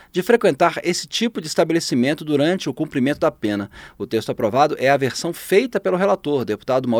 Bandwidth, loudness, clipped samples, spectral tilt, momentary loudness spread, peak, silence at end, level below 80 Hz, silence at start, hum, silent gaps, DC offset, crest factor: over 20 kHz; -20 LUFS; under 0.1%; -5 dB/octave; 7 LU; -2 dBFS; 0 s; -56 dBFS; 0.15 s; none; none; under 0.1%; 18 dB